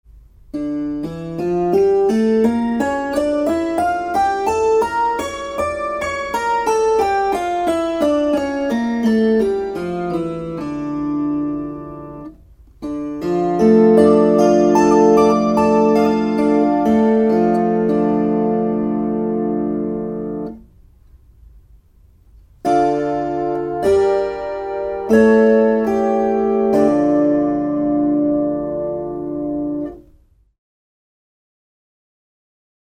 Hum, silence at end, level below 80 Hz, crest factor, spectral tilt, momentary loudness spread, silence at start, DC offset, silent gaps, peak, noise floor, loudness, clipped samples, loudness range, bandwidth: none; 2.8 s; -46 dBFS; 16 dB; -7 dB/octave; 12 LU; 0.55 s; under 0.1%; none; 0 dBFS; -52 dBFS; -17 LUFS; under 0.1%; 11 LU; 14.5 kHz